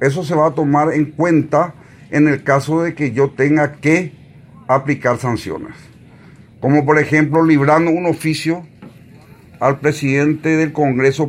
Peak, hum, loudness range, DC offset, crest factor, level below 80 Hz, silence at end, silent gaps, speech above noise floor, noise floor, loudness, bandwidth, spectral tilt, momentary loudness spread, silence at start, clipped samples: 0 dBFS; none; 3 LU; under 0.1%; 16 dB; -56 dBFS; 0 s; none; 27 dB; -42 dBFS; -15 LUFS; 14.5 kHz; -7 dB/octave; 9 LU; 0 s; under 0.1%